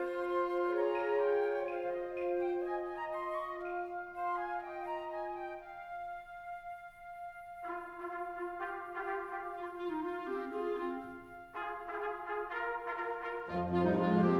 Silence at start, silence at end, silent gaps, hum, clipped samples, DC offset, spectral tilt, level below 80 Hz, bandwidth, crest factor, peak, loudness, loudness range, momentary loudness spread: 0 s; 0 s; none; none; under 0.1%; under 0.1%; -8.5 dB/octave; -66 dBFS; 11.5 kHz; 20 dB; -18 dBFS; -38 LUFS; 9 LU; 14 LU